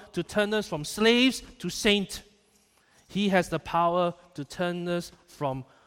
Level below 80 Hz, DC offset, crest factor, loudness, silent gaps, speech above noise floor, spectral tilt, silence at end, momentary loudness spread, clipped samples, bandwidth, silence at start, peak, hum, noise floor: -56 dBFS; under 0.1%; 18 dB; -27 LUFS; none; 37 dB; -4.5 dB/octave; 0.25 s; 13 LU; under 0.1%; 16.5 kHz; 0 s; -10 dBFS; none; -64 dBFS